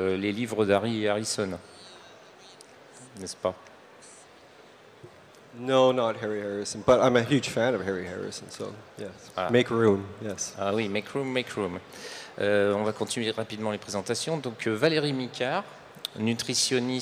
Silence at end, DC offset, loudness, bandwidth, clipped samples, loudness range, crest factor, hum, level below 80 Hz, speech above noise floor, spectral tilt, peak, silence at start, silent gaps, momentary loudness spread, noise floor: 0 s; under 0.1%; -27 LUFS; 16 kHz; under 0.1%; 11 LU; 20 dB; none; -66 dBFS; 25 dB; -4.5 dB/octave; -8 dBFS; 0 s; none; 17 LU; -52 dBFS